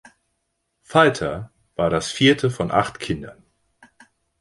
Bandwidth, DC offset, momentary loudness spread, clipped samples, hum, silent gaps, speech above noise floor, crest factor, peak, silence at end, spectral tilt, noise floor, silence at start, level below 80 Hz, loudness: 11.5 kHz; under 0.1%; 15 LU; under 0.1%; none; none; 54 dB; 20 dB; -2 dBFS; 1.1 s; -5 dB/octave; -74 dBFS; 0.9 s; -50 dBFS; -20 LUFS